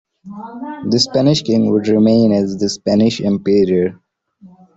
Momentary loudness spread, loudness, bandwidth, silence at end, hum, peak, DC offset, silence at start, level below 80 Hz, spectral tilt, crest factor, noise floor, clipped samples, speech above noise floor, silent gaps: 16 LU; -15 LUFS; 8 kHz; 0.3 s; none; -2 dBFS; under 0.1%; 0.25 s; -52 dBFS; -6 dB/octave; 12 dB; -45 dBFS; under 0.1%; 31 dB; none